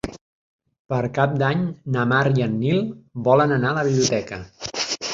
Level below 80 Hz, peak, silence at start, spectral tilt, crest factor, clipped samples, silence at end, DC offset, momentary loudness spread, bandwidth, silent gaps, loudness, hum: -52 dBFS; -4 dBFS; 0.05 s; -5.5 dB/octave; 18 dB; under 0.1%; 0 s; under 0.1%; 12 LU; 7.8 kHz; 0.21-0.59 s, 0.79-0.85 s; -21 LUFS; none